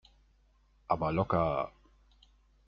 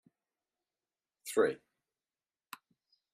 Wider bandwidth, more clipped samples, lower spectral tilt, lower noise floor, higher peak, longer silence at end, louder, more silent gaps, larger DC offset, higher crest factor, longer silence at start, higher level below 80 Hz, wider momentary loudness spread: second, 6.4 kHz vs 14.5 kHz; neither; first, -6.5 dB/octave vs -3.5 dB/octave; second, -67 dBFS vs under -90 dBFS; first, -12 dBFS vs -16 dBFS; second, 1 s vs 1.6 s; about the same, -32 LUFS vs -33 LUFS; neither; neither; about the same, 22 dB vs 24 dB; second, 0.9 s vs 1.25 s; first, -56 dBFS vs -88 dBFS; second, 7 LU vs 21 LU